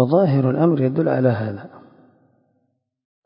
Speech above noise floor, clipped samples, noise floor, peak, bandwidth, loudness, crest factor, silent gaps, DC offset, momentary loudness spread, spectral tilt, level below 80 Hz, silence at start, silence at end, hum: 52 dB; under 0.1%; -70 dBFS; -2 dBFS; 5.4 kHz; -19 LUFS; 18 dB; none; under 0.1%; 11 LU; -13.5 dB/octave; -60 dBFS; 0 s; 1.45 s; none